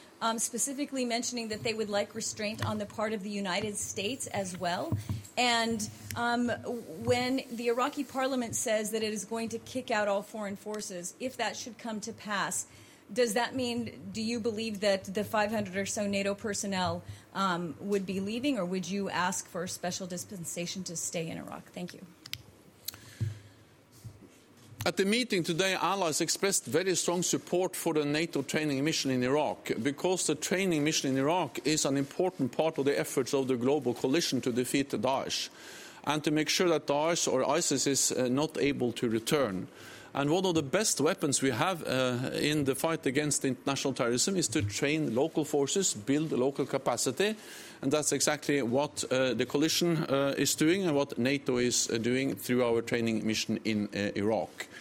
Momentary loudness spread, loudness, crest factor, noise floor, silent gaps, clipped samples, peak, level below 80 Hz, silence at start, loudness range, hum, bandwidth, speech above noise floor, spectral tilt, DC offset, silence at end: 10 LU; -30 LUFS; 20 dB; -58 dBFS; none; under 0.1%; -10 dBFS; -68 dBFS; 0 s; 6 LU; none; 16.5 kHz; 27 dB; -3.5 dB/octave; under 0.1%; 0 s